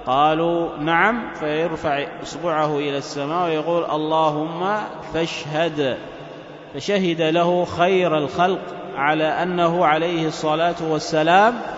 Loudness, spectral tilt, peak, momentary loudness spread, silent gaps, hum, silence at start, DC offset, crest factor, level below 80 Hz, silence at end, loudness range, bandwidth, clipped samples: -20 LUFS; -5.5 dB/octave; -2 dBFS; 10 LU; none; none; 0 s; under 0.1%; 18 dB; -54 dBFS; 0 s; 4 LU; 8 kHz; under 0.1%